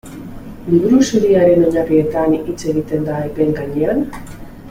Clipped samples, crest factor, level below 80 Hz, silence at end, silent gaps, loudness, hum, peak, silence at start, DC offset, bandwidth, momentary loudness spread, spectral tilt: under 0.1%; 14 dB; -40 dBFS; 0 s; none; -15 LUFS; none; -2 dBFS; 0.05 s; under 0.1%; 16 kHz; 21 LU; -7 dB/octave